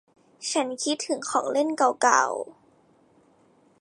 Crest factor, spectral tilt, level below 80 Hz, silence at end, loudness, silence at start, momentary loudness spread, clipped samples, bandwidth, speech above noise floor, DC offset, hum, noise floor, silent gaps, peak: 22 dB; -1 dB/octave; -80 dBFS; 1.3 s; -25 LUFS; 0.4 s; 12 LU; under 0.1%; 11.5 kHz; 36 dB; under 0.1%; none; -61 dBFS; none; -4 dBFS